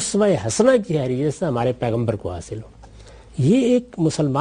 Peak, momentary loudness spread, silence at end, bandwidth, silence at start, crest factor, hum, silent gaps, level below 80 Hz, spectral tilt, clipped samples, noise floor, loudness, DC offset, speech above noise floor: -4 dBFS; 14 LU; 0 s; 11.5 kHz; 0 s; 16 dB; none; none; -48 dBFS; -6 dB/octave; under 0.1%; -43 dBFS; -20 LUFS; under 0.1%; 24 dB